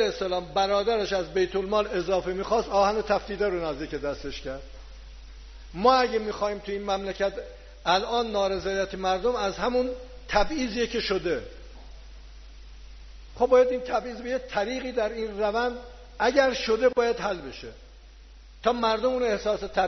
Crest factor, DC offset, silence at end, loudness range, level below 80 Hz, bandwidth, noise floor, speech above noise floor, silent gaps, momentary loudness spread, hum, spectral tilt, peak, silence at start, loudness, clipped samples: 20 dB; under 0.1%; 0 s; 3 LU; -44 dBFS; 6.4 kHz; -48 dBFS; 22 dB; none; 14 LU; none; -2.5 dB/octave; -6 dBFS; 0 s; -26 LUFS; under 0.1%